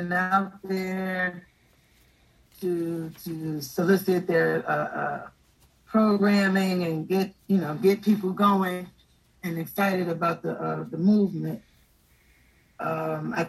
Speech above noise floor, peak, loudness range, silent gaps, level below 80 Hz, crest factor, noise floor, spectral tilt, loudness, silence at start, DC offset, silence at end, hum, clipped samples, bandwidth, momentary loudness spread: 36 dB; -8 dBFS; 5 LU; none; -66 dBFS; 18 dB; -61 dBFS; -6.5 dB/octave; -26 LUFS; 0 s; under 0.1%; 0 s; none; under 0.1%; 13 kHz; 12 LU